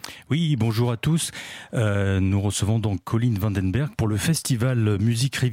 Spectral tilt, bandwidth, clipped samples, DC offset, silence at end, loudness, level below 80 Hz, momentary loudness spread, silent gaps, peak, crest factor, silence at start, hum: -5.5 dB/octave; 16.5 kHz; under 0.1%; under 0.1%; 0 s; -23 LUFS; -48 dBFS; 3 LU; none; -10 dBFS; 12 dB; 0.05 s; none